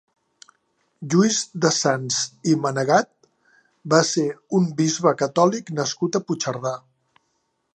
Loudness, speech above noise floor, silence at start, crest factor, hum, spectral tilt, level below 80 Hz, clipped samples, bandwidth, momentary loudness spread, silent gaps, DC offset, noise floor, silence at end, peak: -21 LUFS; 51 dB; 1 s; 20 dB; none; -4.5 dB/octave; -72 dBFS; under 0.1%; 9.6 kHz; 8 LU; none; under 0.1%; -72 dBFS; 0.95 s; -2 dBFS